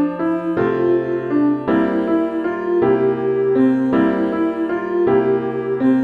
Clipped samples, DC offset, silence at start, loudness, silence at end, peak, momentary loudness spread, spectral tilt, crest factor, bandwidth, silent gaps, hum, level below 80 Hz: under 0.1%; under 0.1%; 0 s; -18 LUFS; 0 s; -4 dBFS; 5 LU; -9 dB/octave; 12 dB; 4.8 kHz; none; none; -52 dBFS